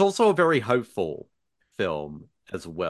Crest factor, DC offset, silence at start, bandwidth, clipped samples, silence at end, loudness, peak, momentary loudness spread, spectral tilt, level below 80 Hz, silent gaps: 18 dB; under 0.1%; 0 s; 12.5 kHz; under 0.1%; 0 s; -24 LUFS; -6 dBFS; 20 LU; -5.5 dB/octave; -58 dBFS; none